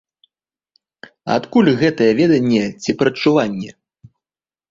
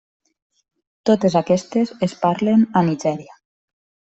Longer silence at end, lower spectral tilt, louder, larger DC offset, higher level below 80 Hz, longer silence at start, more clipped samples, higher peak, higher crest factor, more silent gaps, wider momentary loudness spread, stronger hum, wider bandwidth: about the same, 1 s vs 0.95 s; about the same, -6.5 dB/octave vs -7 dB/octave; first, -16 LUFS vs -19 LUFS; neither; about the same, -56 dBFS vs -60 dBFS; first, 1.25 s vs 1.05 s; neither; about the same, -2 dBFS vs -4 dBFS; about the same, 16 dB vs 18 dB; neither; first, 11 LU vs 8 LU; neither; about the same, 7.6 kHz vs 8.2 kHz